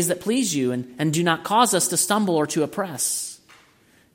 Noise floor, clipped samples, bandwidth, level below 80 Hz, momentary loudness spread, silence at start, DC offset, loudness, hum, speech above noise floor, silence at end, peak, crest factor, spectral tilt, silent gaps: -57 dBFS; under 0.1%; 16.5 kHz; -68 dBFS; 8 LU; 0 s; under 0.1%; -21 LUFS; none; 35 dB; 0.8 s; -2 dBFS; 20 dB; -3.5 dB/octave; none